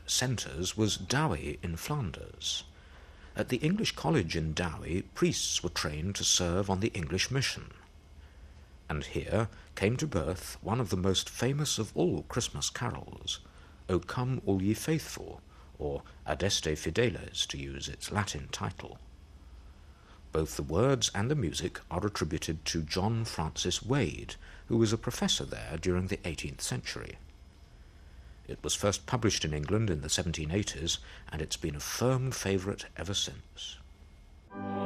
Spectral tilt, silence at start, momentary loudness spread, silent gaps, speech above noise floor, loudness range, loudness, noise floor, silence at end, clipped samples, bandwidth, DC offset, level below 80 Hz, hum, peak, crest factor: -4 dB/octave; 0 s; 11 LU; none; 22 dB; 4 LU; -32 LUFS; -54 dBFS; 0 s; under 0.1%; 14.5 kHz; under 0.1%; -48 dBFS; none; -12 dBFS; 22 dB